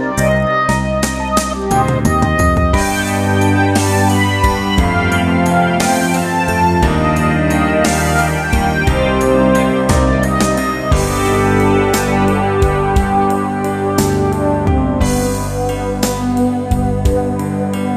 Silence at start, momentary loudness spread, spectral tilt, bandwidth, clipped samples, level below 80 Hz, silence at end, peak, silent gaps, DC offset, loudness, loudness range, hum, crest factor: 0 s; 4 LU; -5.5 dB/octave; 14 kHz; under 0.1%; -24 dBFS; 0 s; 0 dBFS; none; under 0.1%; -14 LUFS; 2 LU; none; 14 dB